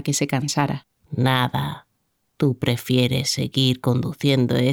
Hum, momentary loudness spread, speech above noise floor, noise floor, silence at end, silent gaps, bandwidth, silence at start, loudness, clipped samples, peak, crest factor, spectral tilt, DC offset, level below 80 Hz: none; 8 LU; 50 dB; -71 dBFS; 0 s; none; 17.5 kHz; 0 s; -21 LUFS; under 0.1%; -6 dBFS; 16 dB; -5 dB/octave; under 0.1%; -54 dBFS